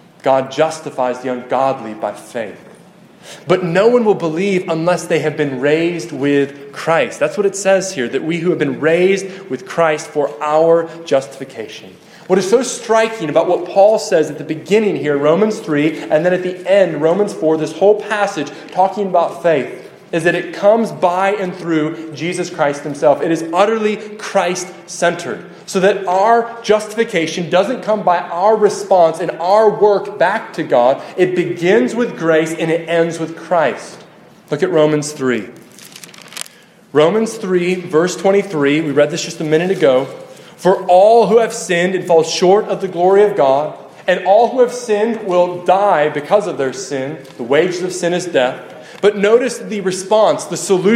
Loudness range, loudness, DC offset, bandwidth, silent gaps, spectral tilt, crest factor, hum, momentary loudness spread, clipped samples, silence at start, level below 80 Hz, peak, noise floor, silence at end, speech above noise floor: 4 LU; -15 LUFS; under 0.1%; 15 kHz; none; -5 dB/octave; 14 dB; none; 11 LU; under 0.1%; 0.25 s; -64 dBFS; 0 dBFS; -43 dBFS; 0 s; 29 dB